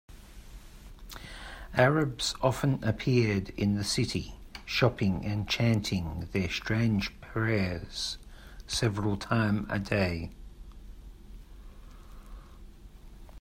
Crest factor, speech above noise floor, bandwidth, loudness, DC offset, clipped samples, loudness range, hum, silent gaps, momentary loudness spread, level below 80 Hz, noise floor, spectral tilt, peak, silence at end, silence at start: 22 dB; 20 dB; 16 kHz; -29 LUFS; under 0.1%; under 0.1%; 5 LU; none; none; 20 LU; -48 dBFS; -49 dBFS; -5.5 dB/octave; -10 dBFS; 0 s; 0.1 s